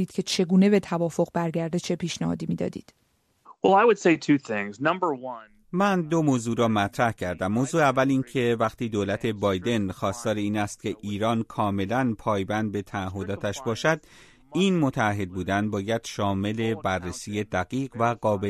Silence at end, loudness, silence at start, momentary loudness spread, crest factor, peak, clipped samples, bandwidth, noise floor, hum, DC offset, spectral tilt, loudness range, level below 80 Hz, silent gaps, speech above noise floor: 0 s; -25 LUFS; 0 s; 9 LU; 20 dB; -6 dBFS; under 0.1%; 13.5 kHz; -55 dBFS; none; under 0.1%; -6 dB/octave; 3 LU; -58 dBFS; none; 30 dB